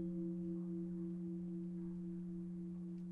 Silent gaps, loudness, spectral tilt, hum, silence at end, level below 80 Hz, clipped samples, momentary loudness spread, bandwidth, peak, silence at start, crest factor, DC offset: none; -46 LUFS; -11.5 dB/octave; none; 0 s; -68 dBFS; under 0.1%; 4 LU; 2.2 kHz; -34 dBFS; 0 s; 10 dB; under 0.1%